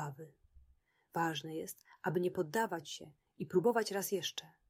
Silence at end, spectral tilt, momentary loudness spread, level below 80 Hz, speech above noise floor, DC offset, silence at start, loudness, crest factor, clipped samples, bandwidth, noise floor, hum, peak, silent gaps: 0.2 s; -4.5 dB/octave; 15 LU; -74 dBFS; 35 dB; under 0.1%; 0 s; -37 LUFS; 20 dB; under 0.1%; 16 kHz; -72 dBFS; none; -20 dBFS; none